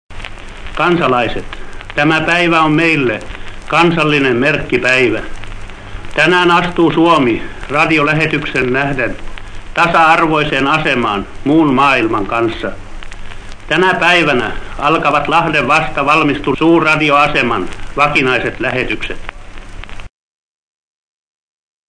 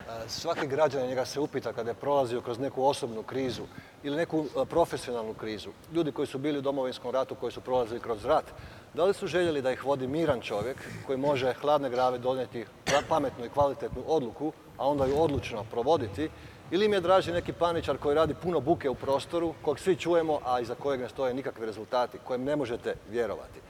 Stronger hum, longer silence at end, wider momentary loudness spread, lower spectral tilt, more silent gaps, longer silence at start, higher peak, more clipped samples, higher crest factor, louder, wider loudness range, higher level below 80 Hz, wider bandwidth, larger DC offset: neither; first, 1.8 s vs 0 s; first, 21 LU vs 9 LU; about the same, -5.5 dB/octave vs -5.5 dB/octave; neither; about the same, 0.1 s vs 0 s; first, 0 dBFS vs -12 dBFS; first, 0.1% vs under 0.1%; about the same, 14 dB vs 18 dB; first, -12 LUFS vs -30 LUFS; about the same, 3 LU vs 4 LU; first, -30 dBFS vs -56 dBFS; second, 11 kHz vs 16.5 kHz; neither